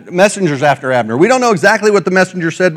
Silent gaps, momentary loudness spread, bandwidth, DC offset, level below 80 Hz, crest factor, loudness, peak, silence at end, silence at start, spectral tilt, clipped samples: none; 4 LU; 16 kHz; under 0.1%; -58 dBFS; 12 dB; -11 LUFS; 0 dBFS; 0 s; 0.05 s; -5 dB/octave; 0.3%